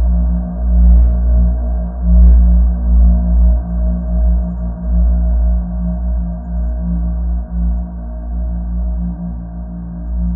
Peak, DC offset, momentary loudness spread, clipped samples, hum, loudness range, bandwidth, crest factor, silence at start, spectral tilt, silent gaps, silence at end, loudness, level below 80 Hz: 0 dBFS; under 0.1%; 13 LU; under 0.1%; 60 Hz at -30 dBFS; 8 LU; 1.7 kHz; 12 dB; 0 s; -14.5 dB/octave; none; 0 s; -16 LUFS; -12 dBFS